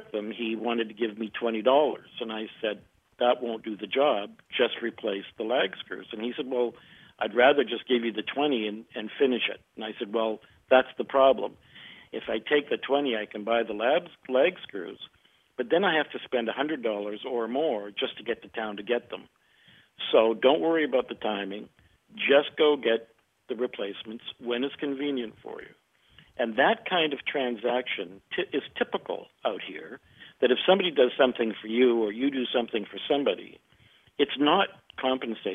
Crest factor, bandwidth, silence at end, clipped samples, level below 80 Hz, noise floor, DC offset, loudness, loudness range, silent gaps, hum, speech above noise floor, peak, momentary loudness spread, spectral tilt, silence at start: 22 dB; 3.9 kHz; 0 s; under 0.1%; -70 dBFS; -60 dBFS; under 0.1%; -27 LUFS; 5 LU; none; none; 33 dB; -6 dBFS; 15 LU; -6.5 dB/octave; 0 s